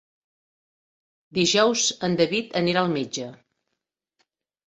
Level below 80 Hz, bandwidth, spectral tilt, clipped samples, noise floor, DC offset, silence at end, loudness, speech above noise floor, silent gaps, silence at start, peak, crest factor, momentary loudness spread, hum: -64 dBFS; 8.4 kHz; -3.5 dB/octave; under 0.1%; -82 dBFS; under 0.1%; 1.3 s; -22 LUFS; 60 dB; none; 1.35 s; -6 dBFS; 20 dB; 12 LU; none